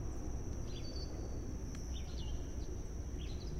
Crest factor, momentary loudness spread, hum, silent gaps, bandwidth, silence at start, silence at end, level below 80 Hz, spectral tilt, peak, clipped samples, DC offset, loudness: 12 dB; 1 LU; none; none; 13 kHz; 0 s; 0 s; -44 dBFS; -5.5 dB/octave; -30 dBFS; under 0.1%; under 0.1%; -45 LUFS